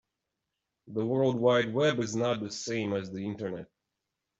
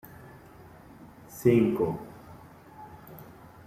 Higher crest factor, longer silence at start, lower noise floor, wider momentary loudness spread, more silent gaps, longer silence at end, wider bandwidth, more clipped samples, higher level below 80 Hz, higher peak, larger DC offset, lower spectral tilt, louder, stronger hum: about the same, 18 dB vs 20 dB; second, 0.85 s vs 1.3 s; first, -85 dBFS vs -51 dBFS; second, 12 LU vs 27 LU; neither; first, 0.75 s vs 0.45 s; second, 8 kHz vs 15.5 kHz; neither; second, -70 dBFS vs -60 dBFS; about the same, -12 dBFS vs -10 dBFS; neither; second, -5.5 dB/octave vs -8 dB/octave; second, -30 LUFS vs -26 LUFS; neither